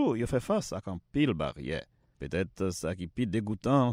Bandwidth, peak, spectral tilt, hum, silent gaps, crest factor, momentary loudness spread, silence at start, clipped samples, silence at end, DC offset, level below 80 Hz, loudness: 16 kHz; -12 dBFS; -6.5 dB/octave; none; none; 18 dB; 9 LU; 0 s; under 0.1%; 0 s; under 0.1%; -52 dBFS; -32 LUFS